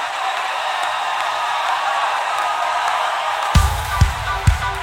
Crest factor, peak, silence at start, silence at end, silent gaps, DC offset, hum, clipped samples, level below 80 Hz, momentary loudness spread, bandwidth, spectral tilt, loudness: 18 dB; -2 dBFS; 0 s; 0 s; none; under 0.1%; none; under 0.1%; -28 dBFS; 4 LU; 16.5 kHz; -4 dB/octave; -19 LUFS